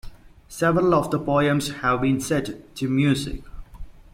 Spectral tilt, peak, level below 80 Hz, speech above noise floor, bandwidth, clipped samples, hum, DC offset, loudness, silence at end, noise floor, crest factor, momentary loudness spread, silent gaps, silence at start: -6 dB/octave; -8 dBFS; -42 dBFS; 23 dB; 16.5 kHz; under 0.1%; none; under 0.1%; -22 LUFS; 0.1 s; -44 dBFS; 16 dB; 13 LU; none; 0.05 s